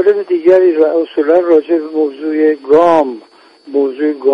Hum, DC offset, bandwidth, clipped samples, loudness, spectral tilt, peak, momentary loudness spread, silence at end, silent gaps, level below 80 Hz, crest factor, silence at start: none; under 0.1%; 6.4 kHz; under 0.1%; -12 LUFS; -7 dB/octave; 0 dBFS; 8 LU; 0 s; none; -60 dBFS; 12 dB; 0 s